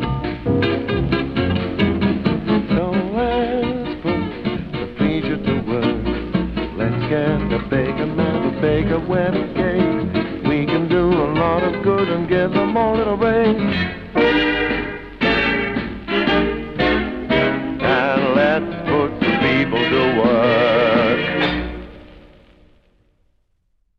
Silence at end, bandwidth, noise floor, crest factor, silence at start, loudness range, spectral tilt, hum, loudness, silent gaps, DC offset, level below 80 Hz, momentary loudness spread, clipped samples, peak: 1.8 s; 6.6 kHz; -64 dBFS; 16 dB; 0 s; 4 LU; -8.5 dB/octave; none; -19 LUFS; none; under 0.1%; -36 dBFS; 7 LU; under 0.1%; -2 dBFS